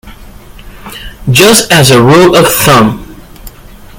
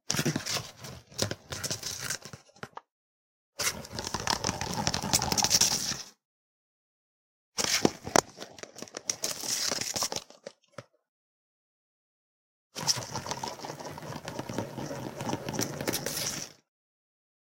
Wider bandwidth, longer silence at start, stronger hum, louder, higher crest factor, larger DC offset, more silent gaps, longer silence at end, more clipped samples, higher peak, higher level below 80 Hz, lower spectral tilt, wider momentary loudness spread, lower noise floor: first, over 20 kHz vs 17 kHz; about the same, 0.05 s vs 0.1 s; neither; first, -4 LUFS vs -30 LUFS; second, 8 dB vs 34 dB; neither; second, none vs 2.91-3.53 s, 6.25-7.52 s, 11.09-12.70 s; second, 0.5 s vs 1 s; first, 3% vs under 0.1%; about the same, 0 dBFS vs 0 dBFS; first, -30 dBFS vs -58 dBFS; first, -4 dB/octave vs -2 dB/octave; about the same, 21 LU vs 20 LU; second, -31 dBFS vs under -90 dBFS